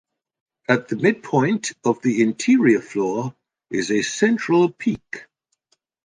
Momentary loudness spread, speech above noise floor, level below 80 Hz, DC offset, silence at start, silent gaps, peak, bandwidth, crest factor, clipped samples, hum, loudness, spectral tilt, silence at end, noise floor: 12 LU; 49 dB; -64 dBFS; under 0.1%; 0.7 s; none; -2 dBFS; 10 kHz; 18 dB; under 0.1%; none; -20 LUFS; -5.5 dB/octave; 0.8 s; -69 dBFS